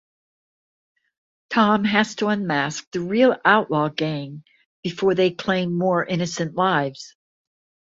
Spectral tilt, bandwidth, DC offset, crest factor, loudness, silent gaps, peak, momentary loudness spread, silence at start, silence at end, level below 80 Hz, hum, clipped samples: -5.5 dB/octave; 7.8 kHz; under 0.1%; 20 dB; -21 LUFS; 2.87-2.92 s, 4.66-4.83 s; -2 dBFS; 13 LU; 1.5 s; 0.75 s; -62 dBFS; none; under 0.1%